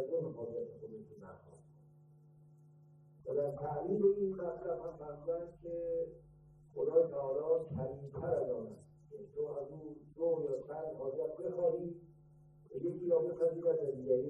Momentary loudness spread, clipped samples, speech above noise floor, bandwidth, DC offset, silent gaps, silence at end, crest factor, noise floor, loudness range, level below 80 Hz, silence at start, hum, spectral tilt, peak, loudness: 18 LU; under 0.1%; 26 dB; 2 kHz; under 0.1%; none; 0 s; 20 dB; -62 dBFS; 4 LU; -70 dBFS; 0 s; none; -11 dB/octave; -18 dBFS; -38 LUFS